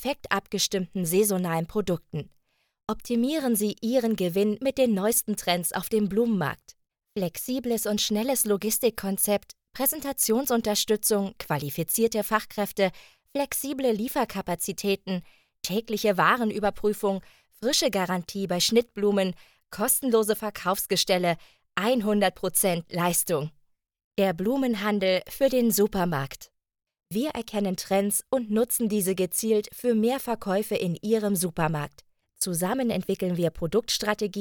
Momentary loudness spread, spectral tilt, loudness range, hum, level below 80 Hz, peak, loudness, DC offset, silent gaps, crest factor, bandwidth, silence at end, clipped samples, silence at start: 8 LU; -4 dB/octave; 2 LU; none; -56 dBFS; -6 dBFS; -26 LUFS; under 0.1%; 24.04-24.11 s; 20 dB; over 20 kHz; 0 s; under 0.1%; 0 s